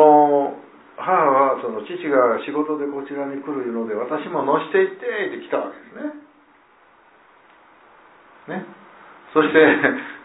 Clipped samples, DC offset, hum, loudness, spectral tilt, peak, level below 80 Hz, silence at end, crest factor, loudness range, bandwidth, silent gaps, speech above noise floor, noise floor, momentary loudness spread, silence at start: under 0.1%; under 0.1%; none; -20 LUFS; -9.5 dB/octave; -2 dBFS; -72 dBFS; 0.05 s; 20 dB; 15 LU; 4 kHz; none; 33 dB; -54 dBFS; 18 LU; 0 s